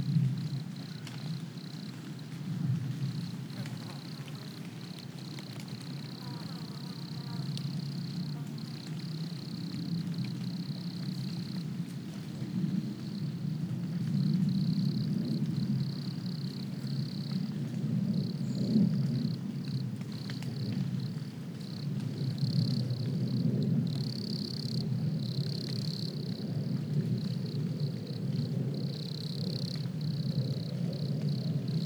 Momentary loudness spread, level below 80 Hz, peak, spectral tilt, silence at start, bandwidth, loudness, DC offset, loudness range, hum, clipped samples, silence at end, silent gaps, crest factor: 10 LU; -78 dBFS; -16 dBFS; -7 dB/octave; 0 s; over 20 kHz; -35 LUFS; under 0.1%; 6 LU; none; under 0.1%; 0 s; none; 18 dB